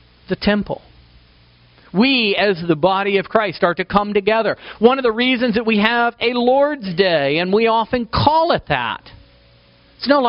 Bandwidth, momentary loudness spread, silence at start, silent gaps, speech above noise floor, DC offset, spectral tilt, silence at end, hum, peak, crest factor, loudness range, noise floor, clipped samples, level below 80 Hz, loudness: 5.6 kHz; 7 LU; 0.3 s; none; 34 dB; under 0.1%; -3 dB/octave; 0 s; none; 0 dBFS; 18 dB; 2 LU; -50 dBFS; under 0.1%; -44 dBFS; -17 LUFS